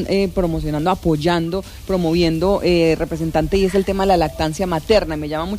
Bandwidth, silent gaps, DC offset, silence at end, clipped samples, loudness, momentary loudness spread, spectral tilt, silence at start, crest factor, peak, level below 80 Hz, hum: 15.5 kHz; none; under 0.1%; 0 s; under 0.1%; -18 LUFS; 6 LU; -6.5 dB/octave; 0 s; 14 dB; -4 dBFS; -32 dBFS; none